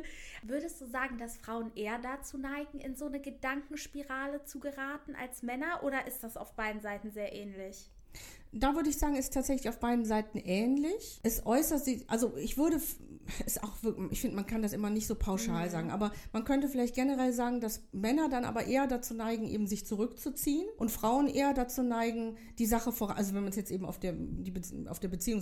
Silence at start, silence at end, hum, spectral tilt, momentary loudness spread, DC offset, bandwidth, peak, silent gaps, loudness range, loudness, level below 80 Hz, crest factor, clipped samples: 0 s; 0 s; none; -4.5 dB/octave; 11 LU; under 0.1%; 18.5 kHz; -16 dBFS; none; 7 LU; -35 LUFS; -48 dBFS; 18 dB; under 0.1%